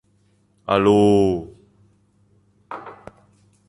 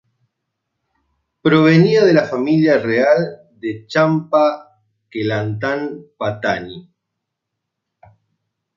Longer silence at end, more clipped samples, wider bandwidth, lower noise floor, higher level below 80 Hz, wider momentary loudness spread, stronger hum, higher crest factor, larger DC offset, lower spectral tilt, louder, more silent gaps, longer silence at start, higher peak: second, 0.75 s vs 1.95 s; neither; first, 11 kHz vs 7.2 kHz; second, -61 dBFS vs -78 dBFS; first, -50 dBFS vs -58 dBFS; first, 24 LU vs 16 LU; first, 50 Hz at -45 dBFS vs none; about the same, 18 dB vs 16 dB; neither; about the same, -7 dB/octave vs -7.5 dB/octave; about the same, -17 LUFS vs -16 LUFS; neither; second, 0.7 s vs 1.45 s; about the same, -4 dBFS vs -2 dBFS